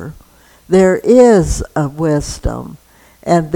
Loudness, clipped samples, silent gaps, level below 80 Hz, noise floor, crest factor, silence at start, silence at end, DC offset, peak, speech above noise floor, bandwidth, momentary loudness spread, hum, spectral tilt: -13 LUFS; 0.1%; none; -28 dBFS; -46 dBFS; 14 dB; 0 s; 0 s; under 0.1%; 0 dBFS; 34 dB; 18 kHz; 20 LU; none; -6.5 dB/octave